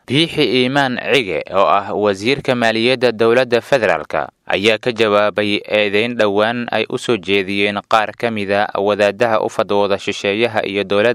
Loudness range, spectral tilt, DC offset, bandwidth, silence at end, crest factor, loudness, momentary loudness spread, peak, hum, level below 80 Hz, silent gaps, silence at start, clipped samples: 2 LU; -5 dB/octave; under 0.1%; 14 kHz; 0 s; 16 dB; -16 LUFS; 5 LU; 0 dBFS; none; -56 dBFS; none; 0.1 s; 0.1%